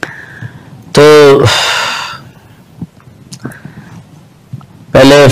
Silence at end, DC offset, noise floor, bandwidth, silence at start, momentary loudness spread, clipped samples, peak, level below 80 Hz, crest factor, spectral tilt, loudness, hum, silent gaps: 0 s; under 0.1%; -38 dBFS; 15.5 kHz; 0.05 s; 26 LU; 0.2%; 0 dBFS; -38 dBFS; 10 dB; -5 dB/octave; -6 LUFS; none; none